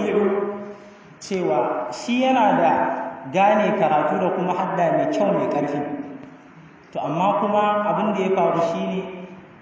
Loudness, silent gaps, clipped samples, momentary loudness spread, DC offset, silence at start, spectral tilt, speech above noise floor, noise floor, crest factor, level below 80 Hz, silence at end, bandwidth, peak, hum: -21 LUFS; none; under 0.1%; 16 LU; under 0.1%; 0 s; -6.5 dB/octave; 26 dB; -46 dBFS; 14 dB; -66 dBFS; 0.1 s; 8 kHz; -6 dBFS; none